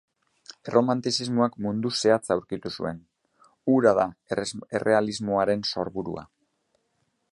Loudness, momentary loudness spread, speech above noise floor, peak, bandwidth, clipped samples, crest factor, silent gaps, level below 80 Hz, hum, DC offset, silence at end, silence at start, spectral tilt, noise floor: -25 LUFS; 12 LU; 49 dB; -6 dBFS; 11.5 kHz; under 0.1%; 20 dB; none; -60 dBFS; none; under 0.1%; 1.1 s; 0.65 s; -5 dB/octave; -73 dBFS